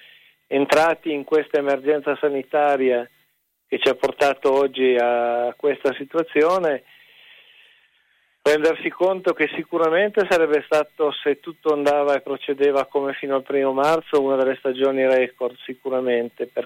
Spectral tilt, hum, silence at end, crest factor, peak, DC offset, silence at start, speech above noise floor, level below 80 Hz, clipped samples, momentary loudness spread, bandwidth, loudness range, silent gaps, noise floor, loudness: -4.5 dB/octave; none; 0 s; 18 dB; -4 dBFS; under 0.1%; 0.5 s; 47 dB; -66 dBFS; under 0.1%; 7 LU; 16 kHz; 3 LU; none; -67 dBFS; -21 LUFS